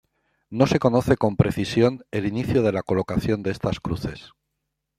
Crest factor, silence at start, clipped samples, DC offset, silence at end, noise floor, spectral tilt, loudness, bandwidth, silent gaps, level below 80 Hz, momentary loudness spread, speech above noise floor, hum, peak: 20 dB; 0.5 s; under 0.1%; under 0.1%; 0.7 s; -79 dBFS; -7 dB/octave; -23 LUFS; 15 kHz; none; -46 dBFS; 10 LU; 57 dB; none; -2 dBFS